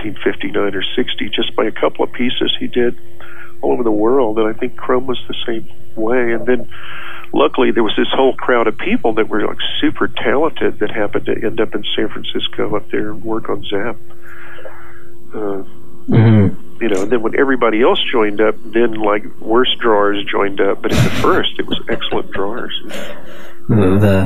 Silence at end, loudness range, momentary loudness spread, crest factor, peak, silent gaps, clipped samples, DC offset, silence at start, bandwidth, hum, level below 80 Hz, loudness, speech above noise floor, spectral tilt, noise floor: 0 s; 6 LU; 13 LU; 16 dB; 0 dBFS; none; under 0.1%; 20%; 0 s; 14 kHz; none; -44 dBFS; -16 LUFS; 22 dB; -6.5 dB/octave; -38 dBFS